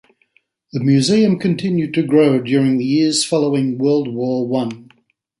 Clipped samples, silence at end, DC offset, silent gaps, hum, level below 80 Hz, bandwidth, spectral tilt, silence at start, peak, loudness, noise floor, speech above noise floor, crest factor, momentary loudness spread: under 0.1%; 0.6 s; under 0.1%; none; none; -60 dBFS; 11.5 kHz; -5.5 dB/octave; 0.75 s; -2 dBFS; -16 LUFS; -61 dBFS; 46 dB; 14 dB; 7 LU